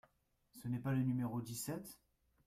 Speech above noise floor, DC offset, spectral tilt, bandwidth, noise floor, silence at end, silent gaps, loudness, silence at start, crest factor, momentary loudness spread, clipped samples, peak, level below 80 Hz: 37 dB; under 0.1%; -6.5 dB/octave; 16 kHz; -77 dBFS; 0.5 s; none; -41 LUFS; 0.55 s; 16 dB; 12 LU; under 0.1%; -26 dBFS; -72 dBFS